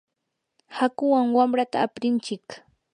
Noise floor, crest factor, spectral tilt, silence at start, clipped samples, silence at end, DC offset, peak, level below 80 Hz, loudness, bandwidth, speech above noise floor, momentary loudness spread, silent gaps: -80 dBFS; 18 dB; -5 dB/octave; 0.7 s; under 0.1%; 0.35 s; under 0.1%; -8 dBFS; -76 dBFS; -23 LUFS; 10 kHz; 57 dB; 18 LU; none